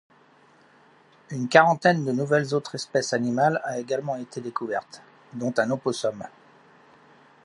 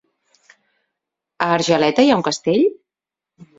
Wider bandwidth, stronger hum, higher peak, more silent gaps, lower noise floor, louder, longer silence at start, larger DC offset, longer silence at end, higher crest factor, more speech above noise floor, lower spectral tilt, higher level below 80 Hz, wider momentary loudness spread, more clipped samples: first, 11.5 kHz vs 7.8 kHz; neither; about the same, -2 dBFS vs 0 dBFS; neither; second, -57 dBFS vs -87 dBFS; second, -24 LUFS vs -17 LUFS; about the same, 1.3 s vs 1.4 s; neither; first, 1.15 s vs 0.15 s; about the same, 24 dB vs 20 dB; second, 33 dB vs 71 dB; about the same, -5 dB/octave vs -4.5 dB/octave; second, -74 dBFS vs -62 dBFS; first, 14 LU vs 6 LU; neither